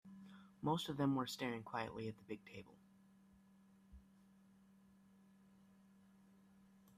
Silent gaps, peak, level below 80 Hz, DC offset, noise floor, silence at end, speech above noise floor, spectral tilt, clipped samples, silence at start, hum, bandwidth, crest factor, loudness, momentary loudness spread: none; -26 dBFS; -76 dBFS; under 0.1%; -69 dBFS; 2.95 s; 26 dB; -5.5 dB/octave; under 0.1%; 0.05 s; none; 14.5 kHz; 22 dB; -43 LUFS; 27 LU